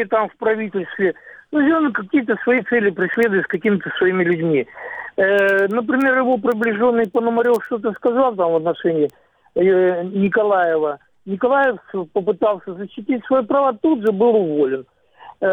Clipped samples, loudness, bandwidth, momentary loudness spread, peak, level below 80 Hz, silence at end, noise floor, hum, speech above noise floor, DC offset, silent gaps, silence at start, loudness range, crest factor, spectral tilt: under 0.1%; -18 LUFS; 19 kHz; 8 LU; -6 dBFS; -62 dBFS; 0 s; -43 dBFS; none; 26 dB; under 0.1%; none; 0 s; 2 LU; 12 dB; -7.5 dB/octave